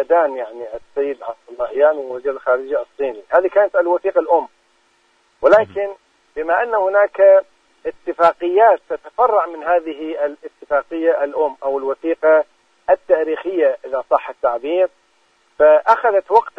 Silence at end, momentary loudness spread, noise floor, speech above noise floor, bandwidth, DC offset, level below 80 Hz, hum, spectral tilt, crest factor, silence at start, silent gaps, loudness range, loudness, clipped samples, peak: 0.1 s; 14 LU; -59 dBFS; 43 dB; 6 kHz; under 0.1%; -58 dBFS; none; -5.5 dB/octave; 16 dB; 0 s; none; 4 LU; -17 LUFS; under 0.1%; -2 dBFS